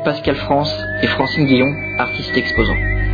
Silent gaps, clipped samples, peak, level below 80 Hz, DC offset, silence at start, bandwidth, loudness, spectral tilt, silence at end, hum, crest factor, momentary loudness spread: none; under 0.1%; 0 dBFS; -28 dBFS; under 0.1%; 0 s; 5 kHz; -17 LUFS; -7 dB/octave; 0 s; none; 16 dB; 5 LU